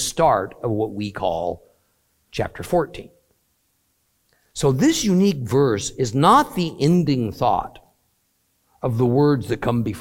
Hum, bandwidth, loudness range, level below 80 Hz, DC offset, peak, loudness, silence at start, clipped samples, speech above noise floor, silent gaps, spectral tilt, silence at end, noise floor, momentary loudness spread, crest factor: none; 17 kHz; 9 LU; -48 dBFS; under 0.1%; -2 dBFS; -20 LUFS; 0 s; under 0.1%; 48 dB; none; -6 dB/octave; 0 s; -67 dBFS; 12 LU; 20 dB